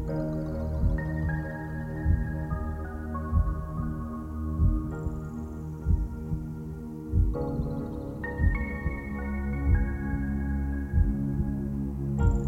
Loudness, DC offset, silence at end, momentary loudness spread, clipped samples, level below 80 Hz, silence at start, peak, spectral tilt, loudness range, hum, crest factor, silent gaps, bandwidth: -31 LUFS; under 0.1%; 0 s; 8 LU; under 0.1%; -32 dBFS; 0 s; -12 dBFS; -9.5 dB/octave; 3 LU; none; 18 dB; none; 7.8 kHz